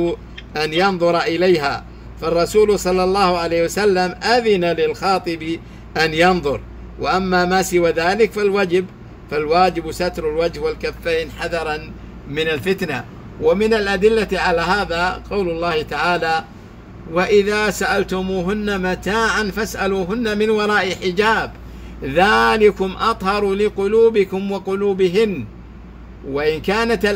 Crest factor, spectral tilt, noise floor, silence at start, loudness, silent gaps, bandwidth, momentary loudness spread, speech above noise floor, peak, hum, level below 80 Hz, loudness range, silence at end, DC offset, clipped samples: 16 dB; -5 dB/octave; -37 dBFS; 0 s; -18 LUFS; none; 16 kHz; 11 LU; 20 dB; -2 dBFS; none; -38 dBFS; 3 LU; 0 s; under 0.1%; under 0.1%